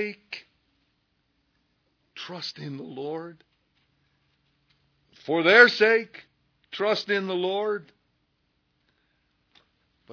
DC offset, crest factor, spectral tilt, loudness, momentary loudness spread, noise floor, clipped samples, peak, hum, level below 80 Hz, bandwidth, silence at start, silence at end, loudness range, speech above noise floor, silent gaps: under 0.1%; 26 dB; -4.5 dB/octave; -23 LUFS; 25 LU; -73 dBFS; under 0.1%; -2 dBFS; none; -80 dBFS; 5.4 kHz; 0 s; 0 s; 17 LU; 49 dB; none